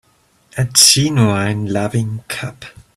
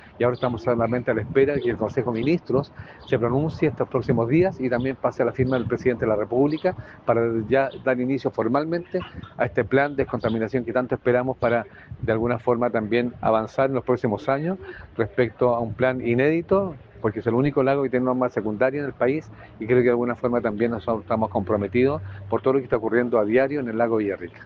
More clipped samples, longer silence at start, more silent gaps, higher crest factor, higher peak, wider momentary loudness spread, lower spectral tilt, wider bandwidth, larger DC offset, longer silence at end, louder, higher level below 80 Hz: neither; first, 0.55 s vs 0.15 s; neither; about the same, 16 dB vs 18 dB; first, 0 dBFS vs -6 dBFS; first, 17 LU vs 6 LU; second, -3 dB/octave vs -9 dB/octave; first, 16 kHz vs 6.6 kHz; neither; first, 0.25 s vs 0 s; first, -13 LUFS vs -23 LUFS; about the same, -48 dBFS vs -52 dBFS